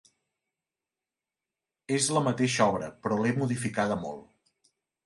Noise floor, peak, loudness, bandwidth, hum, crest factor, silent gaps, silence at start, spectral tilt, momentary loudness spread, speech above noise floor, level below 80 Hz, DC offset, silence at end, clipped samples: under -90 dBFS; -10 dBFS; -28 LUFS; 11.5 kHz; none; 20 dB; none; 1.9 s; -4.5 dB/octave; 9 LU; over 62 dB; -64 dBFS; under 0.1%; 0.8 s; under 0.1%